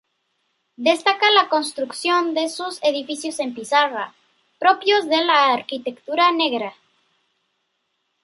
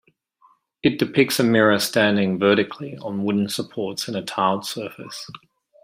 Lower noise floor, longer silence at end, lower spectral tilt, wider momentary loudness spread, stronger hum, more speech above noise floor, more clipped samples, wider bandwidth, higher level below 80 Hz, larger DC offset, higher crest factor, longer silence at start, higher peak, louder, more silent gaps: first, -73 dBFS vs -59 dBFS; first, 1.55 s vs 0.45 s; second, -1.5 dB/octave vs -4.5 dB/octave; second, 12 LU vs 15 LU; neither; first, 53 dB vs 38 dB; neither; second, 11.5 kHz vs 16 kHz; second, -78 dBFS vs -62 dBFS; neither; about the same, 20 dB vs 18 dB; about the same, 0.8 s vs 0.85 s; about the same, -2 dBFS vs -4 dBFS; about the same, -19 LUFS vs -21 LUFS; neither